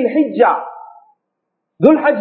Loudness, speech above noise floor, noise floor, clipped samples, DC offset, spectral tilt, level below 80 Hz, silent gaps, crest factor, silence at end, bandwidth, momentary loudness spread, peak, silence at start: -14 LUFS; 62 dB; -75 dBFS; under 0.1%; under 0.1%; -10 dB/octave; -64 dBFS; none; 16 dB; 0 s; 4.4 kHz; 11 LU; 0 dBFS; 0 s